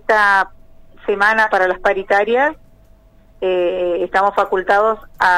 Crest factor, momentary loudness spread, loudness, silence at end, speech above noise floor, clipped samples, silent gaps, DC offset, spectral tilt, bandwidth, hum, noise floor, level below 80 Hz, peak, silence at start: 14 dB; 7 LU; -16 LUFS; 0 s; 32 dB; under 0.1%; none; under 0.1%; -4 dB/octave; 15.5 kHz; 50 Hz at -55 dBFS; -47 dBFS; -46 dBFS; -2 dBFS; 0.1 s